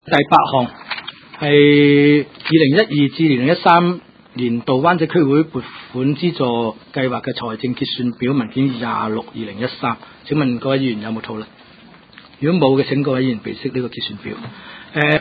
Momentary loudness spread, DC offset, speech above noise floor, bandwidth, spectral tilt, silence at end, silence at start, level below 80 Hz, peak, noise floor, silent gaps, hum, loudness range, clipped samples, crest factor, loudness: 16 LU; under 0.1%; 28 dB; 5 kHz; -9 dB/octave; 0 s; 0.05 s; -56 dBFS; 0 dBFS; -44 dBFS; none; none; 8 LU; under 0.1%; 16 dB; -17 LUFS